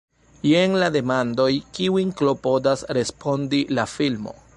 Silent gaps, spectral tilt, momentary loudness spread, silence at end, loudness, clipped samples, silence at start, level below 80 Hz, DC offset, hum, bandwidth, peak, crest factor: none; -5.5 dB/octave; 6 LU; 0.25 s; -22 LUFS; under 0.1%; 0.45 s; -56 dBFS; under 0.1%; none; 11 kHz; -6 dBFS; 16 dB